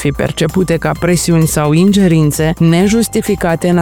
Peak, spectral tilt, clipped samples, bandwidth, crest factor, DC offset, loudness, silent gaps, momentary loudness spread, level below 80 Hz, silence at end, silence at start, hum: 0 dBFS; -6 dB/octave; under 0.1%; 17.5 kHz; 10 dB; 0.4%; -12 LUFS; none; 5 LU; -32 dBFS; 0 s; 0 s; none